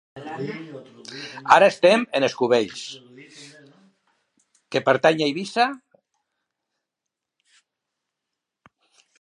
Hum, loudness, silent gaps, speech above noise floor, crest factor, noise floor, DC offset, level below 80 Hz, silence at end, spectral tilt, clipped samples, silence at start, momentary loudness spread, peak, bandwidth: none; -20 LUFS; none; 64 dB; 24 dB; -85 dBFS; under 0.1%; -72 dBFS; 3.45 s; -4.5 dB/octave; under 0.1%; 0.15 s; 25 LU; 0 dBFS; 11 kHz